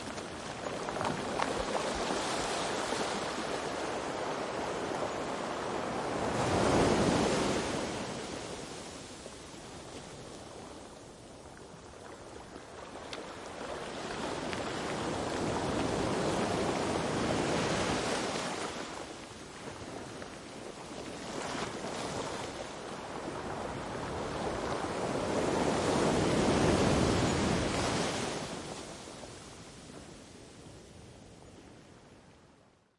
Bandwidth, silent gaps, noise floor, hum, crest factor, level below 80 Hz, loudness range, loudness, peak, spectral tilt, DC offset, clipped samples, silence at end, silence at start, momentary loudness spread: 11.5 kHz; none; -63 dBFS; none; 24 dB; -54 dBFS; 16 LU; -34 LUFS; -10 dBFS; -4.5 dB/octave; under 0.1%; under 0.1%; 0.5 s; 0 s; 20 LU